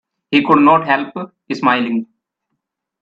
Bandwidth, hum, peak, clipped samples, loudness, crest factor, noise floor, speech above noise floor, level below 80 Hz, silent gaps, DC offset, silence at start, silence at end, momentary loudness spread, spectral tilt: 7.4 kHz; none; 0 dBFS; under 0.1%; -14 LUFS; 16 dB; -75 dBFS; 61 dB; -64 dBFS; none; under 0.1%; 0.3 s; 0.95 s; 15 LU; -6.5 dB/octave